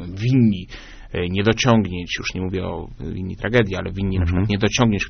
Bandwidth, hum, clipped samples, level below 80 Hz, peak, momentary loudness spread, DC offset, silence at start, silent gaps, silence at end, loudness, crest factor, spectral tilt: 6.6 kHz; none; under 0.1%; -36 dBFS; 0 dBFS; 13 LU; under 0.1%; 0 s; none; 0 s; -21 LUFS; 20 dB; -5.5 dB/octave